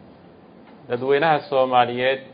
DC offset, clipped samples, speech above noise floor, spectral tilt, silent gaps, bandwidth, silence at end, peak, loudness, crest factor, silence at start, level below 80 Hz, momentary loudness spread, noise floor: under 0.1%; under 0.1%; 27 dB; -10 dB/octave; none; 5.2 kHz; 0 s; -2 dBFS; -20 LUFS; 20 dB; 0.9 s; -64 dBFS; 8 LU; -47 dBFS